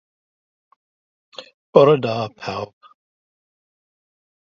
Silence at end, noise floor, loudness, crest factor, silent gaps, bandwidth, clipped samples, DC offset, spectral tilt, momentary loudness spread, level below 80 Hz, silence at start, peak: 1.75 s; under -90 dBFS; -18 LUFS; 24 dB; 1.54-1.73 s; 7 kHz; under 0.1%; under 0.1%; -7 dB/octave; 26 LU; -62 dBFS; 1.4 s; 0 dBFS